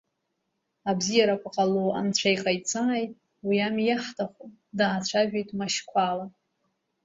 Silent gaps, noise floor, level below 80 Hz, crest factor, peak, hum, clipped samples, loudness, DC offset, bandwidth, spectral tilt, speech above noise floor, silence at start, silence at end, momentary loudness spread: none; -79 dBFS; -68 dBFS; 18 dB; -8 dBFS; none; under 0.1%; -26 LUFS; under 0.1%; 8 kHz; -4 dB/octave; 52 dB; 0.85 s; 0.75 s; 11 LU